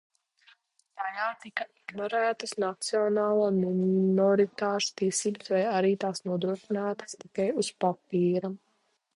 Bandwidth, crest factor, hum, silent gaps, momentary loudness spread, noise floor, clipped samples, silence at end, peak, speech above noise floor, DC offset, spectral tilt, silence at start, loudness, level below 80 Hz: 11.5 kHz; 16 dB; none; none; 11 LU; -73 dBFS; under 0.1%; 0.6 s; -12 dBFS; 45 dB; under 0.1%; -5 dB/octave; 0.95 s; -28 LUFS; -74 dBFS